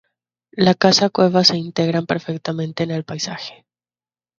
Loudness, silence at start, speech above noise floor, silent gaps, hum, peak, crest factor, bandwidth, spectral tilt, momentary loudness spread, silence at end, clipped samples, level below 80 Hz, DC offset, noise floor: -18 LUFS; 0.55 s; over 72 dB; none; none; 0 dBFS; 20 dB; 7.6 kHz; -4.5 dB/octave; 13 LU; 0.85 s; under 0.1%; -58 dBFS; under 0.1%; under -90 dBFS